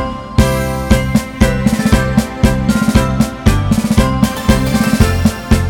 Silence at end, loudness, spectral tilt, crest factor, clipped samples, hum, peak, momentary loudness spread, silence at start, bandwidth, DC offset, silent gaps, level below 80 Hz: 0 s; -13 LUFS; -6 dB/octave; 12 dB; 0.4%; none; 0 dBFS; 3 LU; 0 s; 18 kHz; under 0.1%; none; -20 dBFS